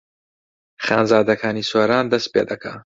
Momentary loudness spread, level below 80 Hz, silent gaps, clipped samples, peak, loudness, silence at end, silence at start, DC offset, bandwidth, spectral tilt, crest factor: 10 LU; -58 dBFS; none; under 0.1%; -2 dBFS; -19 LUFS; 0.15 s; 0.8 s; under 0.1%; 7.8 kHz; -5 dB/octave; 18 dB